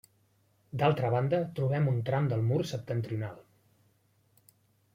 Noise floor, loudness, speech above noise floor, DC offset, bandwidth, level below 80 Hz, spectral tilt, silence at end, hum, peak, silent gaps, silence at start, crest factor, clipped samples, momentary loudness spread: -69 dBFS; -30 LUFS; 40 dB; under 0.1%; 15 kHz; -64 dBFS; -8 dB/octave; 1.55 s; none; -12 dBFS; none; 0.75 s; 20 dB; under 0.1%; 9 LU